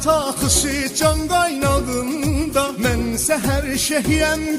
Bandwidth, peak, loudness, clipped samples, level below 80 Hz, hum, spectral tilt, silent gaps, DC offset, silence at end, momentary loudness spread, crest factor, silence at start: 16 kHz; -4 dBFS; -18 LUFS; under 0.1%; -30 dBFS; none; -4 dB/octave; none; under 0.1%; 0 s; 4 LU; 16 dB; 0 s